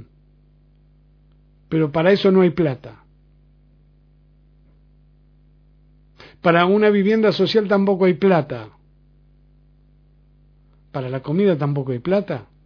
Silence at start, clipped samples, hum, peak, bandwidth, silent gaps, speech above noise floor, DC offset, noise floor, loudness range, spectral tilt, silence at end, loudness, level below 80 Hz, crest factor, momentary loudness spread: 1.7 s; under 0.1%; 50 Hz at -45 dBFS; -2 dBFS; 5.4 kHz; none; 36 dB; under 0.1%; -53 dBFS; 9 LU; -8.5 dB/octave; 0.25 s; -18 LUFS; -54 dBFS; 20 dB; 14 LU